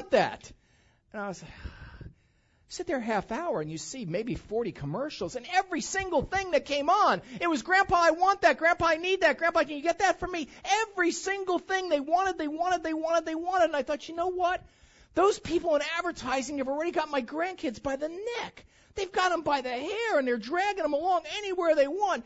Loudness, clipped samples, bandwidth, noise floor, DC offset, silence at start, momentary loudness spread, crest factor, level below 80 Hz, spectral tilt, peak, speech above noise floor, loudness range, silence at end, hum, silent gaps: -28 LUFS; under 0.1%; 8 kHz; -66 dBFS; under 0.1%; 0 s; 12 LU; 20 dB; -56 dBFS; -3.5 dB/octave; -10 dBFS; 38 dB; 9 LU; 0.05 s; none; none